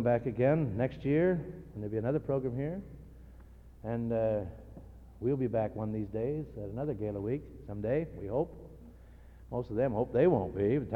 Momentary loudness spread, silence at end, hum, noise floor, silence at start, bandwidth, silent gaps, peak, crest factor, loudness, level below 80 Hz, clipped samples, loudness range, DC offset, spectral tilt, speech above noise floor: 16 LU; 0 s; none; -53 dBFS; 0 s; 5.6 kHz; none; -14 dBFS; 18 dB; -33 LUFS; -52 dBFS; under 0.1%; 4 LU; under 0.1%; -10.5 dB/octave; 21 dB